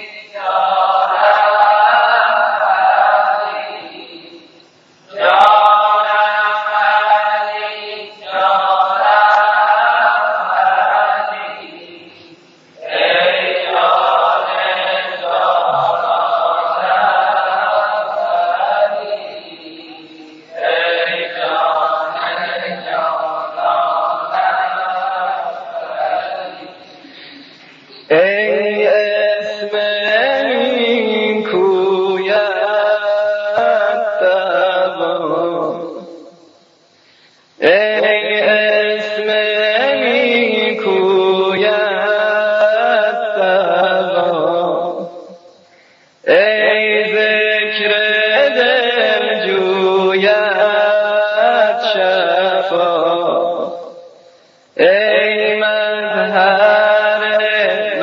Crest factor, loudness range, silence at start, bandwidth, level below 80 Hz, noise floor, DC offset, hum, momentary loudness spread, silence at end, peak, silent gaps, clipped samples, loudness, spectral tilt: 14 dB; 6 LU; 0 s; 7.2 kHz; -76 dBFS; -50 dBFS; under 0.1%; none; 11 LU; 0 s; 0 dBFS; none; under 0.1%; -14 LUFS; -5 dB/octave